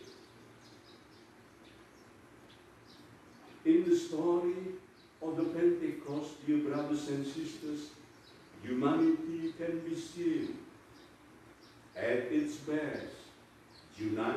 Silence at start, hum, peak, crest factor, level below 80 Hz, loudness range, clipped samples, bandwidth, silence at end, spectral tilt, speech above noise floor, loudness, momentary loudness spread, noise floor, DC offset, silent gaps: 0 s; none; -18 dBFS; 18 dB; -74 dBFS; 5 LU; under 0.1%; 12.5 kHz; 0 s; -6 dB/octave; 25 dB; -34 LUFS; 26 LU; -58 dBFS; under 0.1%; none